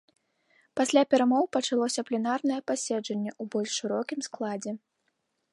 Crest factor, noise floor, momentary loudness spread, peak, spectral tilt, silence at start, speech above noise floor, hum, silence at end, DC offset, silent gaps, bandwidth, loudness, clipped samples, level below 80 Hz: 20 dB; -77 dBFS; 11 LU; -8 dBFS; -3.5 dB/octave; 0.75 s; 50 dB; none; 0.75 s; under 0.1%; none; 11.5 kHz; -28 LUFS; under 0.1%; -80 dBFS